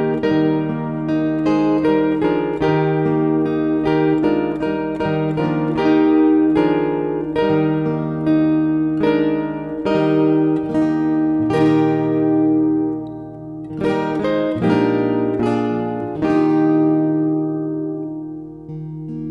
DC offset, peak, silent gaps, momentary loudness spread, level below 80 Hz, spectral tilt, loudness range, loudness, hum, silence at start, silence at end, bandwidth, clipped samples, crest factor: under 0.1%; -4 dBFS; none; 9 LU; -48 dBFS; -9 dB/octave; 2 LU; -18 LUFS; none; 0 s; 0 s; 5.6 kHz; under 0.1%; 14 dB